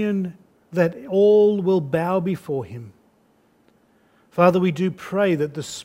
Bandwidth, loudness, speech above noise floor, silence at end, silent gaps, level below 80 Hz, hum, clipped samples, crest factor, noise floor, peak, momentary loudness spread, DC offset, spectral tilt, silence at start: 15.5 kHz; -20 LUFS; 40 dB; 0 s; none; -64 dBFS; none; under 0.1%; 20 dB; -60 dBFS; -2 dBFS; 13 LU; under 0.1%; -7 dB/octave; 0 s